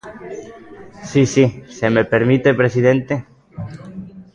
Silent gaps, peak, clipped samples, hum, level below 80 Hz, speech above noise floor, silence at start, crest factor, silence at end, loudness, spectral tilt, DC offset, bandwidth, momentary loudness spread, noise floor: none; -2 dBFS; under 0.1%; none; -50 dBFS; 18 dB; 0.05 s; 16 dB; 0.1 s; -16 LUFS; -6.5 dB/octave; under 0.1%; 9.6 kHz; 20 LU; -34 dBFS